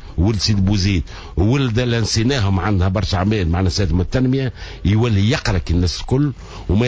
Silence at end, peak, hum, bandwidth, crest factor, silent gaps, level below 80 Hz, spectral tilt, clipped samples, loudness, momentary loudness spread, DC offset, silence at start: 0 s; -6 dBFS; none; 8 kHz; 12 dB; none; -26 dBFS; -6 dB/octave; under 0.1%; -18 LUFS; 5 LU; under 0.1%; 0 s